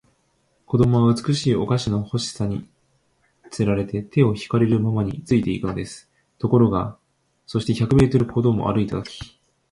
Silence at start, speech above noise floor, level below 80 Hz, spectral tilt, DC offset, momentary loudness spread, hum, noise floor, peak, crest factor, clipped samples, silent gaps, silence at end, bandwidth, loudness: 0.7 s; 46 dB; -44 dBFS; -7.5 dB/octave; under 0.1%; 14 LU; none; -65 dBFS; -4 dBFS; 18 dB; under 0.1%; none; 0.45 s; 11.5 kHz; -21 LUFS